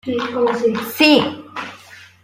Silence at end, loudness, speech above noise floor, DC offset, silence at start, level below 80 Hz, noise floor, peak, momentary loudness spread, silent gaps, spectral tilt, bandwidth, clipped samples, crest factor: 0.2 s; -16 LUFS; 26 dB; under 0.1%; 0.05 s; -64 dBFS; -42 dBFS; -2 dBFS; 18 LU; none; -4.5 dB/octave; 16.5 kHz; under 0.1%; 18 dB